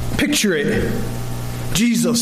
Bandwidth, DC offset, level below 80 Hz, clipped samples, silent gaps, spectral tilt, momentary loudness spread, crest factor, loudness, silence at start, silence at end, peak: 15.5 kHz; under 0.1%; -30 dBFS; under 0.1%; none; -4 dB/octave; 10 LU; 12 dB; -19 LUFS; 0 s; 0 s; -6 dBFS